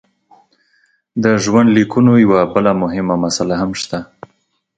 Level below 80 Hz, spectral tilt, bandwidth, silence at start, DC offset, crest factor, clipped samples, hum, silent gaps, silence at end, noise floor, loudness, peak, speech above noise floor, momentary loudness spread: -48 dBFS; -6 dB/octave; 9.2 kHz; 1.15 s; under 0.1%; 14 dB; under 0.1%; none; none; 0.75 s; -63 dBFS; -14 LUFS; 0 dBFS; 49 dB; 12 LU